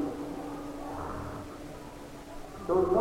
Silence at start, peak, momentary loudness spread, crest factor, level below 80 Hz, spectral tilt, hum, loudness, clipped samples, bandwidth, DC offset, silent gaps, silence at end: 0 s; -14 dBFS; 16 LU; 18 dB; -50 dBFS; -7 dB/octave; none; -36 LUFS; under 0.1%; 16 kHz; under 0.1%; none; 0 s